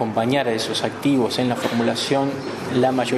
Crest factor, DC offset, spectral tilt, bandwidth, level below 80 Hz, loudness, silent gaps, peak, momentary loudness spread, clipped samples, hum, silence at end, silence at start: 16 dB; under 0.1%; -5 dB/octave; 13.5 kHz; -60 dBFS; -21 LUFS; none; -6 dBFS; 4 LU; under 0.1%; none; 0 s; 0 s